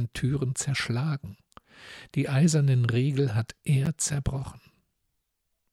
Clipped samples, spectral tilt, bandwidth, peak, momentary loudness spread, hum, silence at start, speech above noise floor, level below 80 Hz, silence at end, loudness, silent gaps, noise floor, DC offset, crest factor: under 0.1%; -5.5 dB/octave; 13.5 kHz; -12 dBFS; 13 LU; none; 0 s; 52 dB; -48 dBFS; 1.15 s; -27 LUFS; none; -78 dBFS; under 0.1%; 16 dB